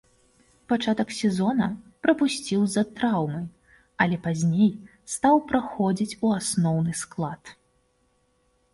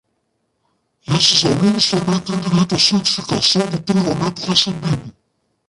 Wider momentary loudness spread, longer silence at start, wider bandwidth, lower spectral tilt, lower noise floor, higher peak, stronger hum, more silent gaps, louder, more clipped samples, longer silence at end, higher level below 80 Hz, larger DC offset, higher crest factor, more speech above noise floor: about the same, 10 LU vs 9 LU; second, 0.7 s vs 1.1 s; about the same, 11.5 kHz vs 11.5 kHz; first, -5.5 dB/octave vs -4 dB/octave; about the same, -68 dBFS vs -69 dBFS; second, -6 dBFS vs -2 dBFS; neither; neither; second, -25 LUFS vs -16 LUFS; neither; first, 1.2 s vs 0.6 s; second, -60 dBFS vs -48 dBFS; neither; about the same, 20 dB vs 16 dB; second, 44 dB vs 52 dB